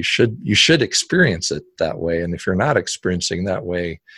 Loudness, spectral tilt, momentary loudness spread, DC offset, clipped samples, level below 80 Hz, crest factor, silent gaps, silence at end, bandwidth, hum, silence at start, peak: -18 LUFS; -4 dB/octave; 10 LU; under 0.1%; under 0.1%; -42 dBFS; 18 dB; none; 0.2 s; 12 kHz; none; 0 s; -2 dBFS